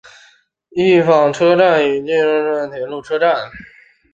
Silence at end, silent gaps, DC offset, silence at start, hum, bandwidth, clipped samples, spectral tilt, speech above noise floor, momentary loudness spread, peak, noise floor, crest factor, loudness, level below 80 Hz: 0.5 s; none; under 0.1%; 0.75 s; none; 7.8 kHz; under 0.1%; -6 dB/octave; 38 dB; 13 LU; -2 dBFS; -52 dBFS; 14 dB; -15 LUFS; -58 dBFS